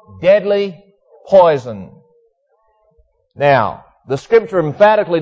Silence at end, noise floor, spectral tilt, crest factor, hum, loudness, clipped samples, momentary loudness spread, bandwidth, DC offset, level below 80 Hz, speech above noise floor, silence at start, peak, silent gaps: 0 s; -60 dBFS; -7 dB/octave; 14 dB; none; -14 LUFS; under 0.1%; 14 LU; 7.8 kHz; under 0.1%; -52 dBFS; 48 dB; 0.15 s; 0 dBFS; none